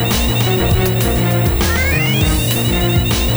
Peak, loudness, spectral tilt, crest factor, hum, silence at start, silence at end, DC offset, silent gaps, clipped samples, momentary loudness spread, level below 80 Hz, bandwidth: -2 dBFS; -14 LUFS; -5 dB/octave; 12 dB; none; 0 s; 0 s; under 0.1%; none; under 0.1%; 1 LU; -22 dBFS; over 20 kHz